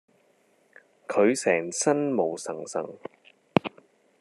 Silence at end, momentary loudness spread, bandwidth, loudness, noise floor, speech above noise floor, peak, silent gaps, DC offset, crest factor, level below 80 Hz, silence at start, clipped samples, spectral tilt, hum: 0.5 s; 18 LU; 13 kHz; -26 LUFS; -65 dBFS; 39 dB; 0 dBFS; none; under 0.1%; 28 dB; -74 dBFS; 1.1 s; under 0.1%; -4.5 dB/octave; none